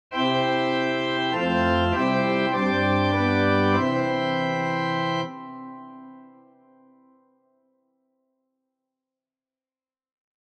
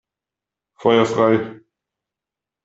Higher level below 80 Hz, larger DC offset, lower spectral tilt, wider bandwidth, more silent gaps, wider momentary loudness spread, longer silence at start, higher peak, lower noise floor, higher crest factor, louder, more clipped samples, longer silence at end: first, -52 dBFS vs -62 dBFS; neither; about the same, -6.5 dB/octave vs -6 dB/octave; about the same, 8.8 kHz vs 8 kHz; neither; first, 14 LU vs 8 LU; second, 0.1 s vs 0.8 s; second, -8 dBFS vs -2 dBFS; about the same, under -90 dBFS vs -87 dBFS; about the same, 16 dB vs 20 dB; second, -23 LUFS vs -17 LUFS; neither; first, 4.2 s vs 1.1 s